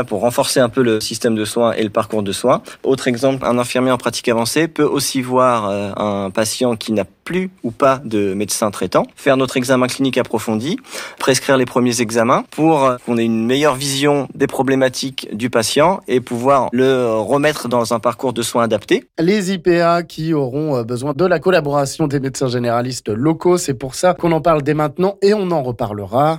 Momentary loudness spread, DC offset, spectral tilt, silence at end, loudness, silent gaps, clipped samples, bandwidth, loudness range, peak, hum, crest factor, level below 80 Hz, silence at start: 6 LU; under 0.1%; -5 dB/octave; 0 s; -17 LUFS; none; under 0.1%; 16.5 kHz; 2 LU; -4 dBFS; none; 12 dB; -50 dBFS; 0 s